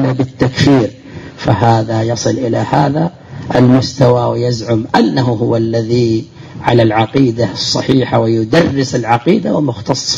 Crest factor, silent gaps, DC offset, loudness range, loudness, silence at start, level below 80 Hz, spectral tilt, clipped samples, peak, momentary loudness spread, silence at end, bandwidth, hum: 12 dB; none; under 0.1%; 1 LU; -13 LUFS; 0 s; -42 dBFS; -6 dB/octave; under 0.1%; 0 dBFS; 6 LU; 0 s; 7.8 kHz; none